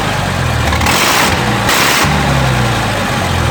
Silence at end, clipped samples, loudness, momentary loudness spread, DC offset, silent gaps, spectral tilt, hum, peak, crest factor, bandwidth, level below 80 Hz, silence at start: 0 s; under 0.1%; -11 LUFS; 5 LU; under 0.1%; none; -3.5 dB/octave; none; 0 dBFS; 12 dB; over 20 kHz; -24 dBFS; 0 s